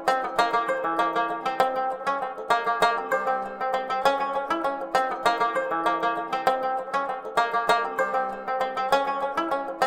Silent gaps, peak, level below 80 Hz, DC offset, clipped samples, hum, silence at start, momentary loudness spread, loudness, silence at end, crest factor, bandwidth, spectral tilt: none; -6 dBFS; -60 dBFS; under 0.1%; under 0.1%; none; 0 s; 5 LU; -25 LUFS; 0 s; 20 dB; 16.5 kHz; -3.5 dB/octave